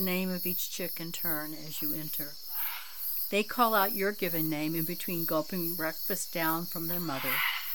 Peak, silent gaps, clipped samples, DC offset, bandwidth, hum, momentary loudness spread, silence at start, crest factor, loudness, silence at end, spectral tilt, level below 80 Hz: -12 dBFS; none; under 0.1%; 0.6%; 19.5 kHz; none; 7 LU; 0 s; 20 dB; -31 LUFS; 0 s; -4 dB/octave; -70 dBFS